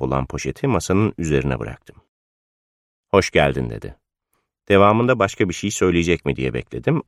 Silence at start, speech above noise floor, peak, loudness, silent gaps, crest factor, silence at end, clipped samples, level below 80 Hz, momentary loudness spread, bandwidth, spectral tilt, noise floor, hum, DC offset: 0 s; 54 dB; -2 dBFS; -19 LUFS; 2.08-3.03 s; 20 dB; 0.05 s; under 0.1%; -40 dBFS; 12 LU; 14.5 kHz; -5.5 dB/octave; -73 dBFS; none; under 0.1%